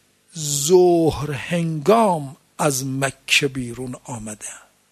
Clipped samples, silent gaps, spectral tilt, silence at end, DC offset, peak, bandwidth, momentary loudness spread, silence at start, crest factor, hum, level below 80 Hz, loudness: under 0.1%; none; -4 dB/octave; 0.35 s; under 0.1%; -2 dBFS; 13.5 kHz; 17 LU; 0.35 s; 18 dB; none; -50 dBFS; -19 LUFS